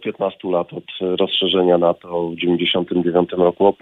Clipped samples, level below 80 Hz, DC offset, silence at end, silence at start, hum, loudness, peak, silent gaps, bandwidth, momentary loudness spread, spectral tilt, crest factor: under 0.1%; -58 dBFS; under 0.1%; 0.1 s; 0 s; none; -18 LUFS; -2 dBFS; none; 4.1 kHz; 8 LU; -8 dB/octave; 16 dB